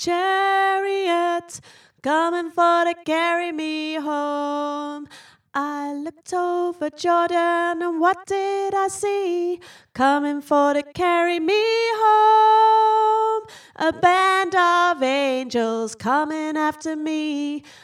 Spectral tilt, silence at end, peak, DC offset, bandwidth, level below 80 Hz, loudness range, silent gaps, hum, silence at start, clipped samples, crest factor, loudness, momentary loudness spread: -3 dB/octave; 0.1 s; -4 dBFS; under 0.1%; 14.5 kHz; -66 dBFS; 7 LU; none; none; 0 s; under 0.1%; 16 dB; -20 LUFS; 11 LU